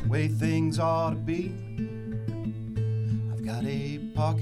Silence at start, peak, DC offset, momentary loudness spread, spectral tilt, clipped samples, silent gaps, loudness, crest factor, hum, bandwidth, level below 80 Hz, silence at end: 0 s; -14 dBFS; under 0.1%; 8 LU; -7.5 dB/octave; under 0.1%; none; -29 LUFS; 14 dB; none; 12 kHz; -48 dBFS; 0 s